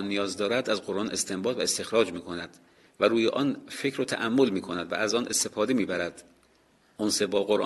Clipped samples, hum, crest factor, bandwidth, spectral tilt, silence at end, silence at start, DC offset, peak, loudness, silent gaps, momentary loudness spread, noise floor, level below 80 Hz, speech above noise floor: under 0.1%; none; 20 dB; 12.5 kHz; -3 dB/octave; 0 s; 0 s; under 0.1%; -8 dBFS; -27 LUFS; none; 7 LU; -63 dBFS; -64 dBFS; 36 dB